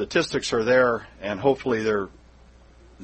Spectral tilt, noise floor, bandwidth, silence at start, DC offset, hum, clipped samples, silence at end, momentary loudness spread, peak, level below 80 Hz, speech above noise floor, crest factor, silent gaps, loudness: -4.5 dB/octave; -51 dBFS; 8.8 kHz; 0 s; under 0.1%; none; under 0.1%; 0 s; 10 LU; -6 dBFS; -52 dBFS; 28 dB; 18 dB; none; -23 LUFS